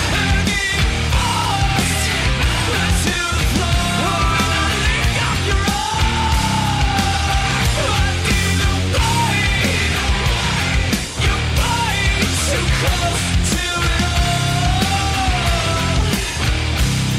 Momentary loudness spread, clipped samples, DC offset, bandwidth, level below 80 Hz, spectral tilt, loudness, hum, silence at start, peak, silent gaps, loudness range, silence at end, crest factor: 2 LU; under 0.1%; under 0.1%; 16 kHz; -22 dBFS; -4 dB/octave; -17 LUFS; none; 0 s; -6 dBFS; none; 1 LU; 0 s; 12 dB